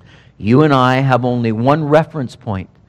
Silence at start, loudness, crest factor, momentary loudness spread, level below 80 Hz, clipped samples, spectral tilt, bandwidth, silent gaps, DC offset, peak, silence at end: 0.4 s; -14 LUFS; 14 dB; 13 LU; -50 dBFS; 0.2%; -8 dB/octave; 9.4 kHz; none; under 0.1%; 0 dBFS; 0.2 s